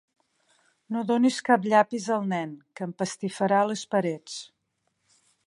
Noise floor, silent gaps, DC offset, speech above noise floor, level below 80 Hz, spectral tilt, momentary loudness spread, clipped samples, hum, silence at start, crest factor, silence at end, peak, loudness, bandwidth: -76 dBFS; none; under 0.1%; 51 dB; -78 dBFS; -5 dB/octave; 15 LU; under 0.1%; none; 0.9 s; 22 dB; 1 s; -6 dBFS; -26 LUFS; 11.5 kHz